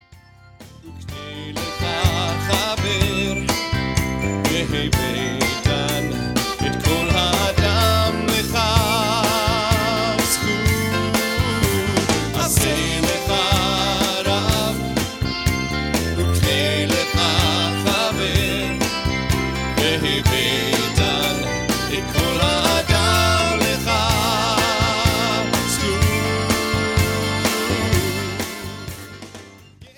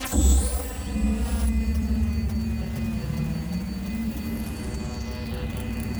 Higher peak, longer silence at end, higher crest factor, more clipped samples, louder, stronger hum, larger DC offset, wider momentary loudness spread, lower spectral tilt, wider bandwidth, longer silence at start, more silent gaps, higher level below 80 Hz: first, 0 dBFS vs -10 dBFS; first, 0.15 s vs 0 s; about the same, 20 dB vs 16 dB; neither; first, -19 LUFS vs -27 LUFS; neither; neither; second, 5 LU vs 9 LU; second, -4 dB/octave vs -5.5 dB/octave; second, 18 kHz vs over 20 kHz; about the same, 0.1 s vs 0 s; neither; about the same, -32 dBFS vs -28 dBFS